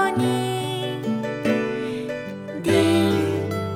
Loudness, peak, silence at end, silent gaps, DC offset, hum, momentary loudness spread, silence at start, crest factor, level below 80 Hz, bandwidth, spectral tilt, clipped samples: -23 LUFS; -6 dBFS; 0 s; none; under 0.1%; none; 10 LU; 0 s; 16 dB; -60 dBFS; 16.5 kHz; -6 dB/octave; under 0.1%